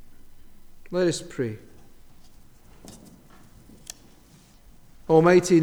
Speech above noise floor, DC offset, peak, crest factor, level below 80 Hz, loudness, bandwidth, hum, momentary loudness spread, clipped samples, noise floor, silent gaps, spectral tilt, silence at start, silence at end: 33 dB; under 0.1%; -6 dBFS; 20 dB; -52 dBFS; -22 LUFS; 16 kHz; none; 30 LU; under 0.1%; -53 dBFS; none; -6 dB/octave; 0 s; 0 s